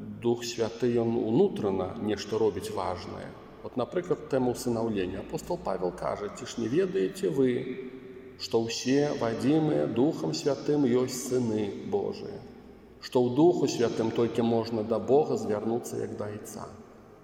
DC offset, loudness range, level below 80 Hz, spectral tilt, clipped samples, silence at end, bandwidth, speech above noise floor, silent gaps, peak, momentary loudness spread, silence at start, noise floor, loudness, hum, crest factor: under 0.1%; 4 LU; -60 dBFS; -6 dB/octave; under 0.1%; 0.05 s; 16 kHz; 22 dB; none; -12 dBFS; 14 LU; 0 s; -50 dBFS; -29 LUFS; none; 18 dB